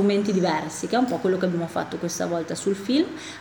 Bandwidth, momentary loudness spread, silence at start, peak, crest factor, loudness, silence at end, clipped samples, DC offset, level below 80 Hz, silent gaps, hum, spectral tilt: over 20 kHz; 6 LU; 0 s; -10 dBFS; 14 dB; -25 LUFS; 0 s; under 0.1%; under 0.1%; -66 dBFS; none; none; -5 dB/octave